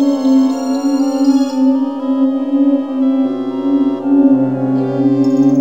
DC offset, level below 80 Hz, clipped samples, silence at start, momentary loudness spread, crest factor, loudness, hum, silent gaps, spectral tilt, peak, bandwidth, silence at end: 0.5%; -62 dBFS; under 0.1%; 0 s; 4 LU; 12 dB; -14 LUFS; none; none; -7.5 dB/octave; 0 dBFS; 7.6 kHz; 0 s